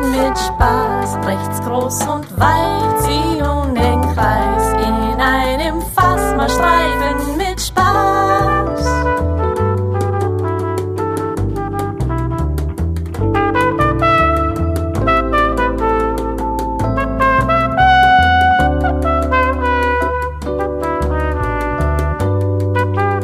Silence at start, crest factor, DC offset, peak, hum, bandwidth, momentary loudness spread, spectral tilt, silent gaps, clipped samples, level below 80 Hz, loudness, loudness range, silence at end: 0 s; 14 dB; under 0.1%; 0 dBFS; none; 15.5 kHz; 7 LU; -5.5 dB/octave; none; under 0.1%; -24 dBFS; -15 LUFS; 5 LU; 0 s